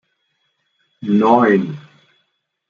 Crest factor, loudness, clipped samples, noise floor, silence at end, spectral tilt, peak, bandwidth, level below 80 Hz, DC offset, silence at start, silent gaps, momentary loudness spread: 18 dB; -15 LUFS; under 0.1%; -69 dBFS; 0.9 s; -8.5 dB/octave; -2 dBFS; 7 kHz; -66 dBFS; under 0.1%; 1 s; none; 18 LU